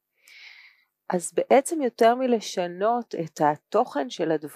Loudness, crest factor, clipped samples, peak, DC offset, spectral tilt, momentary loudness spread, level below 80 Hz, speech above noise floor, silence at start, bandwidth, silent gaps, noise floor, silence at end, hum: -24 LUFS; 18 dB; under 0.1%; -6 dBFS; under 0.1%; -4.5 dB/octave; 9 LU; -82 dBFS; 33 dB; 0.4 s; 15.5 kHz; none; -57 dBFS; 0 s; none